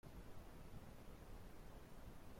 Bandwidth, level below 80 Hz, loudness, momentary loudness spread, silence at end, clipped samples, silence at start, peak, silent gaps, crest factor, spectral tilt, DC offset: 16.5 kHz; -60 dBFS; -61 LUFS; 1 LU; 0 s; under 0.1%; 0.05 s; -44 dBFS; none; 12 dB; -6 dB/octave; under 0.1%